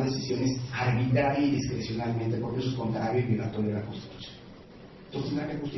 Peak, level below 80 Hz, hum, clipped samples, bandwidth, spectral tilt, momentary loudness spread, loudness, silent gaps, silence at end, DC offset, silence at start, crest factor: -14 dBFS; -54 dBFS; none; under 0.1%; 6.2 kHz; -7 dB/octave; 18 LU; -29 LUFS; none; 0 s; under 0.1%; 0 s; 16 dB